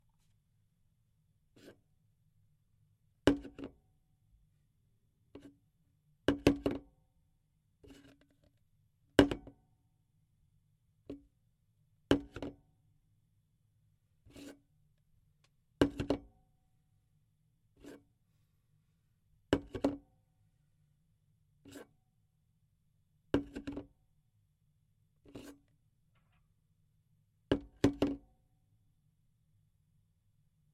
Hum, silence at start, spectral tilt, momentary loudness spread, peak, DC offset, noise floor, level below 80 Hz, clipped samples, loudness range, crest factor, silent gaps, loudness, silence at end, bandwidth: none; 1.65 s; -6 dB/octave; 24 LU; -8 dBFS; under 0.1%; -76 dBFS; -58 dBFS; under 0.1%; 7 LU; 34 dB; none; -35 LUFS; 2.55 s; 13.5 kHz